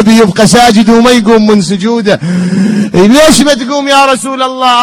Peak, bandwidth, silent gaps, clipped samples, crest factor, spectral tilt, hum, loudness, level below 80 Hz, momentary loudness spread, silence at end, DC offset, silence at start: 0 dBFS; 15.5 kHz; none; 6%; 6 dB; -4.5 dB/octave; none; -6 LUFS; -34 dBFS; 7 LU; 0 s; under 0.1%; 0 s